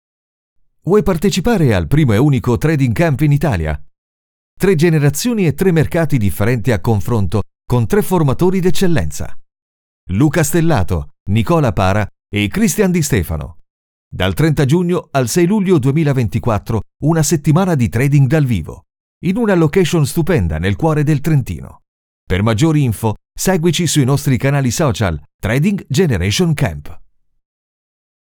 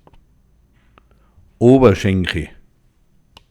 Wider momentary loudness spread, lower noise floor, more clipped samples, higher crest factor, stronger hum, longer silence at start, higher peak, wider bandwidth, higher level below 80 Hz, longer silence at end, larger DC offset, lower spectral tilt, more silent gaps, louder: second, 8 LU vs 15 LU; first, under -90 dBFS vs -56 dBFS; neither; second, 12 dB vs 18 dB; neither; second, 0.85 s vs 1.6 s; about the same, -2 dBFS vs 0 dBFS; first, 20 kHz vs 12 kHz; first, -34 dBFS vs -40 dBFS; first, 1.35 s vs 1.05 s; neither; second, -6 dB/octave vs -7.5 dB/octave; first, 3.98-4.57 s, 9.62-10.07 s, 11.20-11.26 s, 13.70-14.11 s, 19.00-19.21 s, 21.88-22.27 s, 25.34-25.39 s vs none; about the same, -15 LUFS vs -14 LUFS